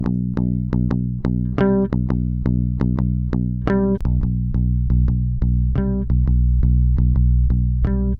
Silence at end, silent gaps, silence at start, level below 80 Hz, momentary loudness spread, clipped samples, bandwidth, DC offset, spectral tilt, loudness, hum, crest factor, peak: 0 s; none; 0 s; -20 dBFS; 4 LU; under 0.1%; 3.4 kHz; under 0.1%; -11.5 dB/octave; -20 LUFS; none; 14 dB; -2 dBFS